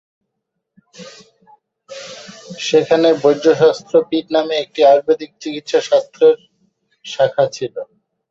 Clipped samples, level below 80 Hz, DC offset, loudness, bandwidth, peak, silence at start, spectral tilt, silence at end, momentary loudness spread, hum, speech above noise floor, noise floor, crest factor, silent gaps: under 0.1%; -64 dBFS; under 0.1%; -15 LUFS; 7.8 kHz; -2 dBFS; 1 s; -4.5 dB/octave; 0.45 s; 21 LU; none; 61 dB; -76 dBFS; 16 dB; none